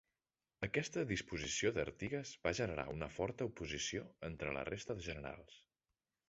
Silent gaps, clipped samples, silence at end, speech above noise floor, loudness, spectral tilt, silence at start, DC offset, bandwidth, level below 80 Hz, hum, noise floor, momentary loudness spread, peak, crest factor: none; under 0.1%; 0.7 s; over 48 dB; -42 LUFS; -4 dB/octave; 0.6 s; under 0.1%; 8 kHz; -60 dBFS; none; under -90 dBFS; 8 LU; -20 dBFS; 22 dB